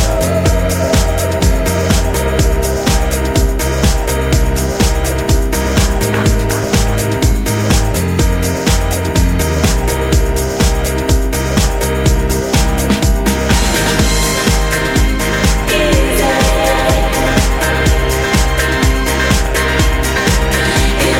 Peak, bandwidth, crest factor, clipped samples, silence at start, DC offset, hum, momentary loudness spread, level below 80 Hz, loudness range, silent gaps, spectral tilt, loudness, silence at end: 0 dBFS; 16.5 kHz; 12 dB; under 0.1%; 0 s; under 0.1%; none; 2 LU; -16 dBFS; 2 LU; none; -4.5 dB/octave; -13 LUFS; 0 s